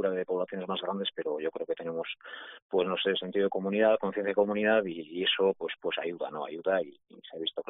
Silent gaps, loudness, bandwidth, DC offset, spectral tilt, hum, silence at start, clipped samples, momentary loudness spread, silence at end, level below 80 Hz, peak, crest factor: 2.62-2.70 s; -30 LUFS; 4 kHz; under 0.1%; -2.5 dB/octave; none; 0 s; under 0.1%; 10 LU; 0.05 s; -80 dBFS; -12 dBFS; 20 dB